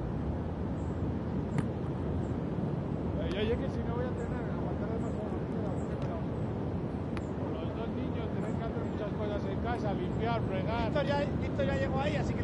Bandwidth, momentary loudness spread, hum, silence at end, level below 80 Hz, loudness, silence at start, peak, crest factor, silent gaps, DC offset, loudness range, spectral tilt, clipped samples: 11 kHz; 4 LU; none; 0 s; -46 dBFS; -34 LUFS; 0 s; -18 dBFS; 16 dB; none; under 0.1%; 3 LU; -8.5 dB/octave; under 0.1%